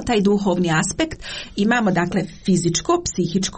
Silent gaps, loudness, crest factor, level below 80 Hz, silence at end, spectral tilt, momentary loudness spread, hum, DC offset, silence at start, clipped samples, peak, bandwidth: none; -20 LUFS; 14 dB; -42 dBFS; 0 s; -4.5 dB/octave; 6 LU; none; under 0.1%; 0 s; under 0.1%; -6 dBFS; 8.8 kHz